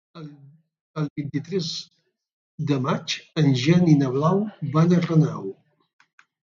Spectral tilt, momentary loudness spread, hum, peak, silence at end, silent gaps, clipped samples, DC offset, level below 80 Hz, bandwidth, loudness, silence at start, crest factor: -7 dB/octave; 17 LU; none; -4 dBFS; 0.95 s; 0.81-0.94 s, 1.10-1.16 s, 2.32-2.58 s; under 0.1%; under 0.1%; -64 dBFS; 7.4 kHz; -22 LUFS; 0.15 s; 18 dB